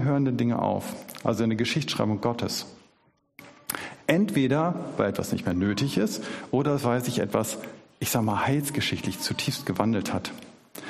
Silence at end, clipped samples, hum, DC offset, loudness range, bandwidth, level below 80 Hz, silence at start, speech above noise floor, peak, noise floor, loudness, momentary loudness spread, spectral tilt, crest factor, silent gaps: 0 s; under 0.1%; none; under 0.1%; 2 LU; 15.5 kHz; -60 dBFS; 0 s; 40 dB; -6 dBFS; -66 dBFS; -27 LUFS; 9 LU; -5 dB/octave; 20 dB; none